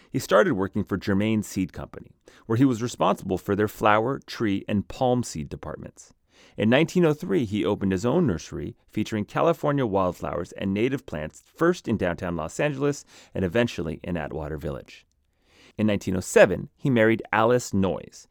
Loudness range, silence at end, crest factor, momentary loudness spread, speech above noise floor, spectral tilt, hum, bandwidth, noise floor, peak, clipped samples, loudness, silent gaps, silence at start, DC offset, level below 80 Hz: 4 LU; 0.1 s; 22 dB; 14 LU; 39 dB; -6 dB/octave; none; 19 kHz; -64 dBFS; -2 dBFS; under 0.1%; -25 LUFS; none; 0.15 s; under 0.1%; -50 dBFS